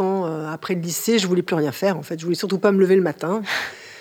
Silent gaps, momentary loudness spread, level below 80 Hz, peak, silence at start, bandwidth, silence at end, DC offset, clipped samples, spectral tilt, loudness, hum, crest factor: none; 9 LU; -72 dBFS; -6 dBFS; 0 s; 19 kHz; 0 s; under 0.1%; under 0.1%; -5 dB/octave; -21 LUFS; none; 16 dB